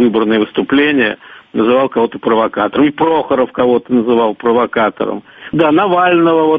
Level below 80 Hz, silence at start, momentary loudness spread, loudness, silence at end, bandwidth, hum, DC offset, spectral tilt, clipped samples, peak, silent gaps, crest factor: -52 dBFS; 0 s; 6 LU; -13 LUFS; 0 s; 4.9 kHz; none; under 0.1%; -8.5 dB/octave; under 0.1%; 0 dBFS; none; 12 dB